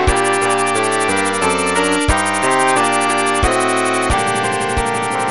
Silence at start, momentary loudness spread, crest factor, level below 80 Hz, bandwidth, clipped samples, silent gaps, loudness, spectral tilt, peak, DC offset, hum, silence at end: 0 s; 4 LU; 14 dB; -28 dBFS; 12 kHz; under 0.1%; none; -15 LUFS; -3.5 dB/octave; 0 dBFS; 1%; none; 0 s